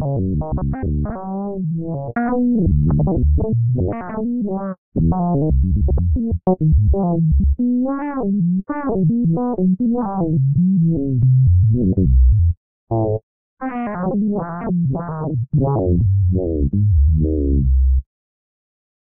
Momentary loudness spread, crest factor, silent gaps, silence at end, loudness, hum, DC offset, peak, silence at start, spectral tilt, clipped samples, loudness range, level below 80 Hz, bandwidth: 8 LU; 12 dB; 4.78-4.92 s, 12.57-12.87 s, 13.23-13.57 s; 1.1 s; -18 LUFS; none; 0.6%; -6 dBFS; 0 s; -9.5 dB/octave; under 0.1%; 4 LU; -22 dBFS; 2.6 kHz